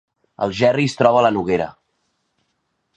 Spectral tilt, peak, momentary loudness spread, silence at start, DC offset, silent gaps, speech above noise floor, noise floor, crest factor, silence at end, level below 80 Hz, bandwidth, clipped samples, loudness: -6 dB/octave; 0 dBFS; 10 LU; 0.4 s; under 0.1%; none; 54 dB; -71 dBFS; 20 dB; 1.25 s; -54 dBFS; 9.4 kHz; under 0.1%; -18 LUFS